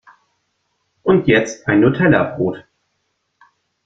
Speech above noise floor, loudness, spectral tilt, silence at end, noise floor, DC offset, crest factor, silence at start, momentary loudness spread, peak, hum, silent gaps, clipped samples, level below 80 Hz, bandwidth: 55 dB; -16 LUFS; -6.5 dB/octave; 1.25 s; -70 dBFS; under 0.1%; 18 dB; 1.05 s; 10 LU; -2 dBFS; none; none; under 0.1%; -50 dBFS; 7.8 kHz